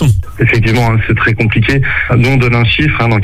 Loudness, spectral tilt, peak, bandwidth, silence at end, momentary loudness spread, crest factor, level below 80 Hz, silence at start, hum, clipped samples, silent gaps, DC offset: -10 LUFS; -6.5 dB/octave; 0 dBFS; 13 kHz; 0 s; 2 LU; 10 dB; -24 dBFS; 0 s; none; under 0.1%; none; under 0.1%